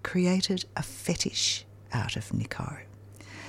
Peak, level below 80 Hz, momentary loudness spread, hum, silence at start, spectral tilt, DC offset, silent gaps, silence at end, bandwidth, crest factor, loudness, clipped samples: -12 dBFS; -54 dBFS; 19 LU; none; 0 s; -4 dB/octave; under 0.1%; none; 0 s; 15.5 kHz; 18 dB; -30 LUFS; under 0.1%